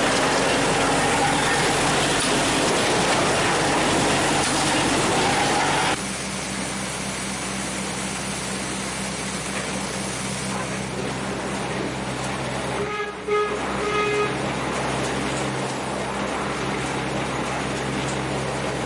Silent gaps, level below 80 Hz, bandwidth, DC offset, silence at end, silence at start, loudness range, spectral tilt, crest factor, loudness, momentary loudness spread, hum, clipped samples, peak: none; -44 dBFS; 12 kHz; under 0.1%; 0 s; 0 s; 7 LU; -3 dB/octave; 14 dB; -23 LUFS; 7 LU; none; under 0.1%; -10 dBFS